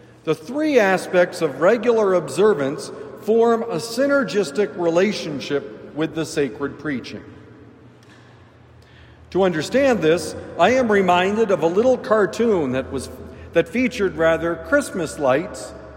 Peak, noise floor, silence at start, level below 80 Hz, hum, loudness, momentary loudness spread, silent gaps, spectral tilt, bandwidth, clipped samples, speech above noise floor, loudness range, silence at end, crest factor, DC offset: -4 dBFS; -48 dBFS; 0.25 s; -54 dBFS; none; -20 LUFS; 11 LU; none; -5 dB/octave; 16 kHz; under 0.1%; 28 dB; 10 LU; 0 s; 16 dB; under 0.1%